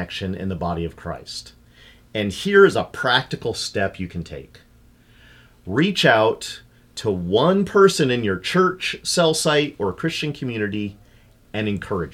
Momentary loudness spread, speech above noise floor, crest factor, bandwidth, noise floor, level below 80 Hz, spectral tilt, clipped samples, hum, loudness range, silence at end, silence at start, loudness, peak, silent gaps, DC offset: 17 LU; 32 dB; 20 dB; 15.5 kHz; -52 dBFS; -48 dBFS; -4.5 dB/octave; under 0.1%; 60 Hz at -60 dBFS; 4 LU; 0 s; 0 s; -20 LUFS; -2 dBFS; none; under 0.1%